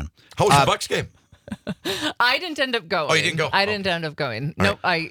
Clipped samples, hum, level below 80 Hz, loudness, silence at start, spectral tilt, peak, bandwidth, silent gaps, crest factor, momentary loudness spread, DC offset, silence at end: under 0.1%; none; -50 dBFS; -21 LUFS; 0 s; -4 dB/octave; -2 dBFS; 19.5 kHz; none; 20 dB; 14 LU; under 0.1%; 0 s